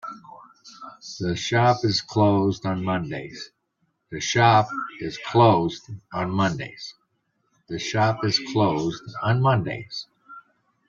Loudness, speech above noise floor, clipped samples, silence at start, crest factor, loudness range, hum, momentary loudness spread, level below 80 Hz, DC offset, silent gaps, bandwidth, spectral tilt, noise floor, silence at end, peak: -23 LUFS; 50 dB; under 0.1%; 0.05 s; 22 dB; 3 LU; none; 20 LU; -58 dBFS; under 0.1%; none; 7.6 kHz; -5.5 dB/octave; -72 dBFS; 0.5 s; -2 dBFS